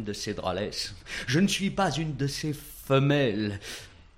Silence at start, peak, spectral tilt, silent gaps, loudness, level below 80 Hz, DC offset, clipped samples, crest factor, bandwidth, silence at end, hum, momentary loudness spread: 0 s; -10 dBFS; -5 dB/octave; none; -28 LUFS; -50 dBFS; under 0.1%; under 0.1%; 18 dB; 16 kHz; 0.15 s; none; 12 LU